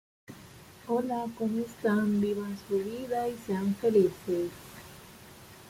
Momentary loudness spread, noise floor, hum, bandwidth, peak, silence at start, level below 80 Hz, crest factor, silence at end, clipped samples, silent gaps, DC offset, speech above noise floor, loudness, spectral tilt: 23 LU; -51 dBFS; none; 16.5 kHz; -14 dBFS; 0.3 s; -64 dBFS; 18 dB; 0 s; under 0.1%; none; under 0.1%; 22 dB; -30 LUFS; -7 dB/octave